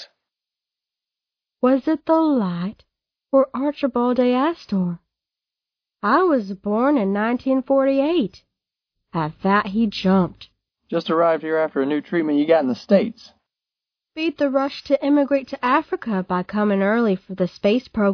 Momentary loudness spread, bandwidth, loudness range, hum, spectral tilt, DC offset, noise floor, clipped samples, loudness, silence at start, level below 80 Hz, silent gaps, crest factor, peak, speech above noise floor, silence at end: 8 LU; 5.4 kHz; 2 LU; none; -8 dB/octave; under 0.1%; -88 dBFS; under 0.1%; -20 LUFS; 0 s; -58 dBFS; none; 18 dB; -2 dBFS; 68 dB; 0 s